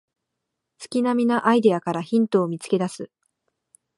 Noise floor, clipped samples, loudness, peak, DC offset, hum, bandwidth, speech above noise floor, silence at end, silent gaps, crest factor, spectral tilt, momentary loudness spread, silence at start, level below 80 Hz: -81 dBFS; under 0.1%; -22 LUFS; -4 dBFS; under 0.1%; none; 11.5 kHz; 60 dB; 0.9 s; none; 20 dB; -6.5 dB/octave; 11 LU; 0.8 s; -74 dBFS